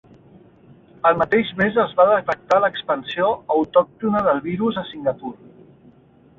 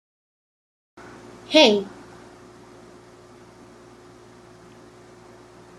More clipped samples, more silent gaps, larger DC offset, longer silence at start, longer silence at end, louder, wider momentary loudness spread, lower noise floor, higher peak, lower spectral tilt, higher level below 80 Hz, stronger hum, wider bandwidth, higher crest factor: neither; neither; neither; second, 1.05 s vs 1.5 s; second, 1.05 s vs 3.9 s; about the same, -19 LUFS vs -17 LUFS; second, 9 LU vs 30 LU; about the same, -51 dBFS vs -48 dBFS; about the same, -2 dBFS vs -2 dBFS; first, -7 dB/octave vs -3.5 dB/octave; first, -56 dBFS vs -64 dBFS; neither; second, 7.2 kHz vs 13.5 kHz; second, 18 dB vs 26 dB